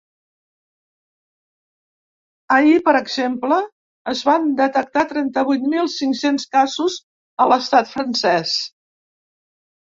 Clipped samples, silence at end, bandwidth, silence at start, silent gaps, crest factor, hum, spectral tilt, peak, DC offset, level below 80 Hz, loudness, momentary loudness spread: under 0.1%; 1.2 s; 7.8 kHz; 2.5 s; 3.72-4.05 s, 7.03-7.37 s; 18 dB; none; -3.5 dB/octave; -2 dBFS; under 0.1%; -66 dBFS; -18 LUFS; 9 LU